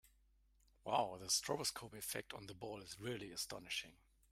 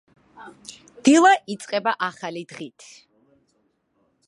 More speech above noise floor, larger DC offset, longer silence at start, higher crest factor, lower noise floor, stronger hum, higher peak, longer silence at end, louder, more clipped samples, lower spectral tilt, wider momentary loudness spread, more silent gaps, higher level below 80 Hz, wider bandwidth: second, 29 dB vs 47 dB; neither; second, 0.05 s vs 0.4 s; about the same, 22 dB vs 20 dB; first, -74 dBFS vs -68 dBFS; neither; second, -24 dBFS vs -2 dBFS; second, 0.4 s vs 1.6 s; second, -43 LUFS vs -20 LUFS; neither; about the same, -2 dB/octave vs -3 dB/octave; second, 13 LU vs 26 LU; neither; about the same, -72 dBFS vs -76 dBFS; first, 16 kHz vs 11.5 kHz